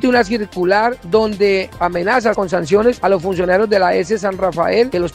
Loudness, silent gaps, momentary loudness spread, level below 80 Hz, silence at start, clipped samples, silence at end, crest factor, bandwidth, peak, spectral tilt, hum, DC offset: -15 LUFS; none; 4 LU; -42 dBFS; 0 s; under 0.1%; 0 s; 14 dB; 15 kHz; 0 dBFS; -5.5 dB/octave; none; under 0.1%